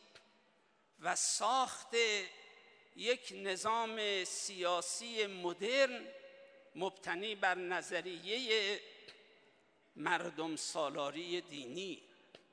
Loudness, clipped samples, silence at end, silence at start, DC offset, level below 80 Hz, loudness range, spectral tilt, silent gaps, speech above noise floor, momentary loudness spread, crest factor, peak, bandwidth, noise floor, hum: -37 LUFS; under 0.1%; 0.15 s; 0.15 s; under 0.1%; -90 dBFS; 3 LU; -1.5 dB/octave; none; 35 dB; 14 LU; 22 dB; -16 dBFS; 11 kHz; -73 dBFS; none